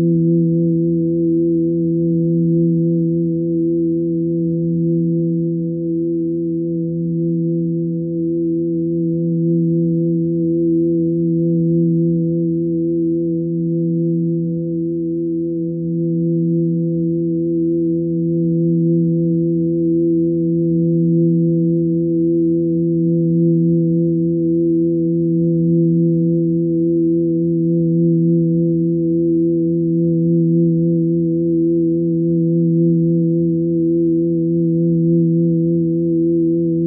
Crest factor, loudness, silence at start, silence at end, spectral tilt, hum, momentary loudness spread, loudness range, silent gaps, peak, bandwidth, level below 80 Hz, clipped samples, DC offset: 10 dB; -17 LUFS; 0 s; 0 s; -22.5 dB/octave; none; 4 LU; 3 LU; none; -6 dBFS; 0.6 kHz; -52 dBFS; under 0.1%; under 0.1%